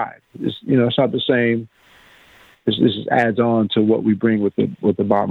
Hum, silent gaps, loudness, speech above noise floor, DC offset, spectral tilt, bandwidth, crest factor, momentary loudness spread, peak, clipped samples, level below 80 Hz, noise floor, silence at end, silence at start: none; none; -18 LUFS; 32 dB; under 0.1%; -8.5 dB/octave; 4.7 kHz; 18 dB; 9 LU; -2 dBFS; under 0.1%; -58 dBFS; -50 dBFS; 0 s; 0 s